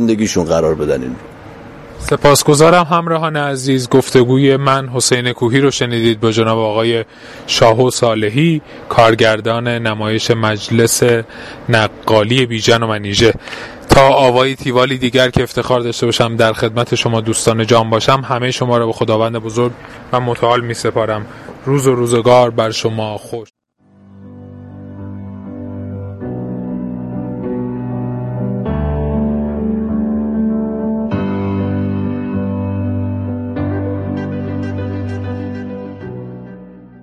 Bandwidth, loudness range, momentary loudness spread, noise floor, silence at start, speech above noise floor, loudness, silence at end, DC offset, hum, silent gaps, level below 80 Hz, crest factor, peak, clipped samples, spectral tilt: 15 kHz; 11 LU; 17 LU; -48 dBFS; 0 s; 35 dB; -14 LUFS; 0.05 s; under 0.1%; none; none; -36 dBFS; 14 dB; 0 dBFS; under 0.1%; -5 dB/octave